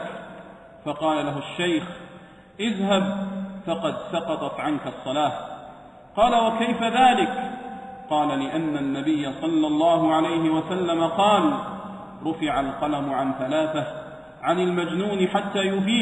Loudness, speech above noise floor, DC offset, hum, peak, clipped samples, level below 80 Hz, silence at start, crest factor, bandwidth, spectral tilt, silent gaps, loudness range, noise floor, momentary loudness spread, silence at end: -24 LUFS; 23 dB; under 0.1%; none; -6 dBFS; under 0.1%; -56 dBFS; 0 s; 18 dB; 10.5 kHz; -5.5 dB/octave; none; 5 LU; -46 dBFS; 17 LU; 0 s